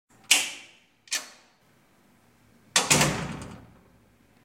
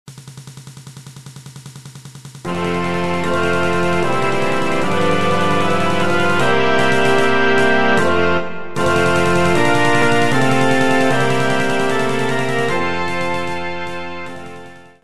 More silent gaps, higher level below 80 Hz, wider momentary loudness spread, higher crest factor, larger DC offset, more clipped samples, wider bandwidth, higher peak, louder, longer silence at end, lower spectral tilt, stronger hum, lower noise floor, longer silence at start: neither; second, -54 dBFS vs -46 dBFS; about the same, 22 LU vs 22 LU; first, 26 dB vs 16 dB; second, under 0.1% vs 9%; neither; first, 16.5 kHz vs 14.5 kHz; about the same, -4 dBFS vs -2 dBFS; second, -24 LUFS vs -16 LUFS; first, 0.85 s vs 0 s; second, -1.5 dB/octave vs -5 dB/octave; neither; first, -62 dBFS vs -38 dBFS; first, 0.3 s vs 0.05 s